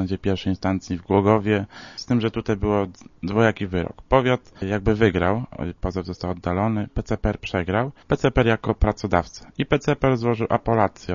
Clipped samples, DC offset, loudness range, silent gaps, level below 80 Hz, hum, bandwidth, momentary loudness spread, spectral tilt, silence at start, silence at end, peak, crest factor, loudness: under 0.1%; under 0.1%; 2 LU; none; -36 dBFS; none; 7.4 kHz; 9 LU; -7 dB/octave; 0 s; 0 s; -2 dBFS; 20 dB; -23 LUFS